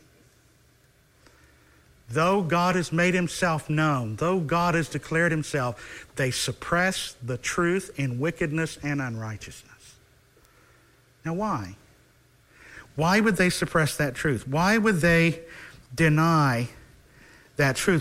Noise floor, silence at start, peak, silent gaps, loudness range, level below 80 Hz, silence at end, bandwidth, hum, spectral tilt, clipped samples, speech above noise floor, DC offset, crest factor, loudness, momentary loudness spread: -60 dBFS; 2.1 s; -8 dBFS; none; 10 LU; -50 dBFS; 0 s; 16 kHz; none; -5.5 dB/octave; under 0.1%; 36 dB; under 0.1%; 18 dB; -25 LUFS; 15 LU